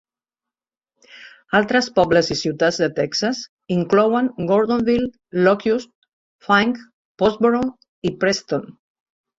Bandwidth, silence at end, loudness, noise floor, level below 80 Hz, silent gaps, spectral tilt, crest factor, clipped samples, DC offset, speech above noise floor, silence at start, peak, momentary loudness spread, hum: 7.8 kHz; 0.7 s; -19 LUFS; -89 dBFS; -54 dBFS; 3.49-3.57 s, 5.95-6.02 s, 6.13-6.39 s, 6.93-7.15 s, 7.88-8.02 s; -5 dB/octave; 18 dB; under 0.1%; under 0.1%; 71 dB; 1.15 s; -2 dBFS; 10 LU; none